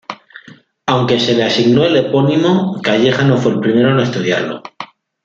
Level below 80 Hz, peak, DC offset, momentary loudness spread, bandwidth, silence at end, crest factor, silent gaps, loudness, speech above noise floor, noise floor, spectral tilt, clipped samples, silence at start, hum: -54 dBFS; -2 dBFS; under 0.1%; 17 LU; 7.6 kHz; 0.4 s; 12 dB; none; -13 LUFS; 29 dB; -42 dBFS; -6 dB/octave; under 0.1%; 0.1 s; none